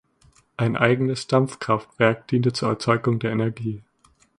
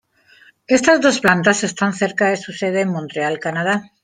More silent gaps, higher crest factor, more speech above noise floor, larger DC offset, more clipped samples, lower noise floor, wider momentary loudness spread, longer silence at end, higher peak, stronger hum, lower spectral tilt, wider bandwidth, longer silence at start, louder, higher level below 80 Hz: neither; about the same, 22 dB vs 18 dB; about the same, 36 dB vs 33 dB; neither; neither; first, -58 dBFS vs -51 dBFS; about the same, 9 LU vs 8 LU; first, 0.6 s vs 0.2 s; about the same, 0 dBFS vs 0 dBFS; neither; first, -6.5 dB/octave vs -4 dB/octave; second, 11 kHz vs 16 kHz; about the same, 0.6 s vs 0.7 s; second, -22 LUFS vs -17 LUFS; about the same, -58 dBFS vs -60 dBFS